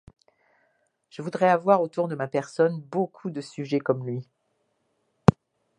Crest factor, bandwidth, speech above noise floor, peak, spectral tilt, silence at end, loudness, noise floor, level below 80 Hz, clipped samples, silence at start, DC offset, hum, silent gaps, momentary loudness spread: 26 dB; 10 kHz; 48 dB; 0 dBFS; -7.5 dB/octave; 0.5 s; -25 LUFS; -73 dBFS; -56 dBFS; under 0.1%; 1.2 s; under 0.1%; none; none; 13 LU